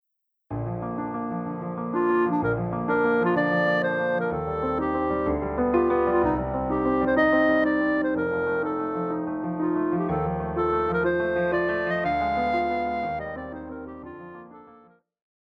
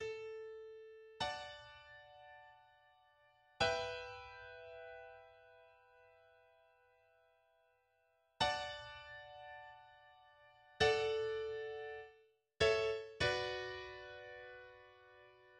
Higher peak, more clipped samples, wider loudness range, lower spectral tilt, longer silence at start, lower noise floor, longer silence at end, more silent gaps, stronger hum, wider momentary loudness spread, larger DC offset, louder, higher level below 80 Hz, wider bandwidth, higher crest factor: first, -8 dBFS vs -20 dBFS; neither; second, 4 LU vs 12 LU; first, -9 dB/octave vs -3.5 dB/octave; first, 0.5 s vs 0 s; second, -55 dBFS vs -78 dBFS; first, 0.8 s vs 0 s; neither; neither; second, 10 LU vs 24 LU; neither; first, -25 LUFS vs -40 LUFS; first, -46 dBFS vs -66 dBFS; second, 6 kHz vs 10.5 kHz; second, 16 dB vs 24 dB